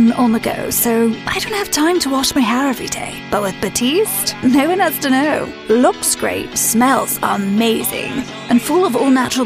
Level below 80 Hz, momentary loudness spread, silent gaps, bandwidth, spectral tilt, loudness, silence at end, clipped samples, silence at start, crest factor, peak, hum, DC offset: -46 dBFS; 6 LU; none; 15.5 kHz; -3 dB/octave; -15 LUFS; 0 s; under 0.1%; 0 s; 14 dB; 0 dBFS; none; under 0.1%